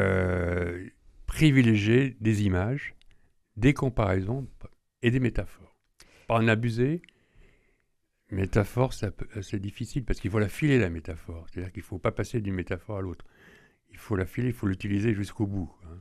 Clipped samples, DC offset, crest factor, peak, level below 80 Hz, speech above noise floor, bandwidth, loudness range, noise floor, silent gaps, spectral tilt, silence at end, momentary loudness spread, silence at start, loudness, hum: under 0.1%; under 0.1%; 22 dB; -6 dBFS; -44 dBFS; 47 dB; 13.5 kHz; 7 LU; -73 dBFS; none; -7 dB/octave; 0 s; 15 LU; 0 s; -28 LUFS; none